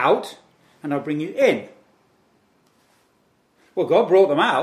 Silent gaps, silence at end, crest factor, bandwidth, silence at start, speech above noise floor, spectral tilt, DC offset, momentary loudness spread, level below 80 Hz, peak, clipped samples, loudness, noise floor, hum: none; 0 s; 18 dB; 14 kHz; 0 s; 44 dB; -5.5 dB/octave; under 0.1%; 15 LU; -78 dBFS; -4 dBFS; under 0.1%; -20 LUFS; -63 dBFS; none